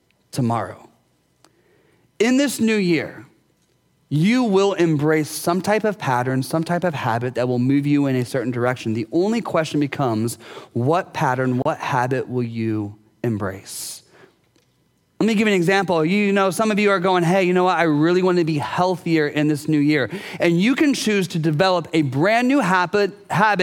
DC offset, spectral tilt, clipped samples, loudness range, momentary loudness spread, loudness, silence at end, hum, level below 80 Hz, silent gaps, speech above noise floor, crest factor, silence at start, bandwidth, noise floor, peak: under 0.1%; -6 dB/octave; under 0.1%; 5 LU; 8 LU; -20 LUFS; 0 s; none; -66 dBFS; none; 44 dB; 18 dB; 0.35 s; 17.5 kHz; -63 dBFS; -2 dBFS